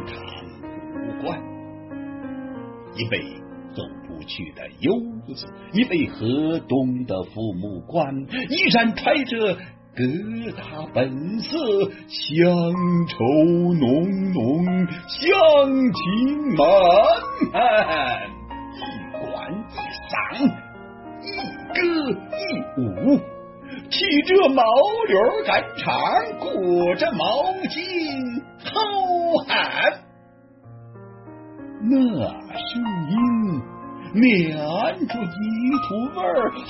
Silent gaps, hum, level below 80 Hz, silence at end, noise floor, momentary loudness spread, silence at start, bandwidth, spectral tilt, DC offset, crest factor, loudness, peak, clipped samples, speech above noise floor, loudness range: none; none; -52 dBFS; 0 s; -50 dBFS; 19 LU; 0 s; 6 kHz; -9 dB/octave; under 0.1%; 18 dB; -21 LUFS; -4 dBFS; under 0.1%; 30 dB; 10 LU